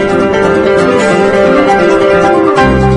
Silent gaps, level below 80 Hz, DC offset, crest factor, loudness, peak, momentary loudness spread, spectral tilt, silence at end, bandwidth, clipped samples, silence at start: none; -26 dBFS; under 0.1%; 8 dB; -8 LUFS; 0 dBFS; 2 LU; -6 dB/octave; 0 s; 10.5 kHz; 0.6%; 0 s